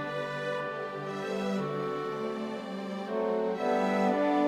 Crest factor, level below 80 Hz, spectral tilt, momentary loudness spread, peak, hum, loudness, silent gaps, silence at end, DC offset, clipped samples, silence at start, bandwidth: 16 dB; -70 dBFS; -6.5 dB/octave; 9 LU; -16 dBFS; none; -32 LUFS; none; 0 s; under 0.1%; under 0.1%; 0 s; 14 kHz